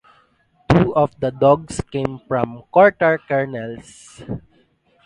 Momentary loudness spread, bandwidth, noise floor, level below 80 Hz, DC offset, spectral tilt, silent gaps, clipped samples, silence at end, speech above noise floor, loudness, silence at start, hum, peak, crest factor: 18 LU; 11 kHz; -59 dBFS; -44 dBFS; under 0.1%; -7 dB/octave; none; under 0.1%; 0.65 s; 40 dB; -18 LUFS; 0.7 s; none; 0 dBFS; 20 dB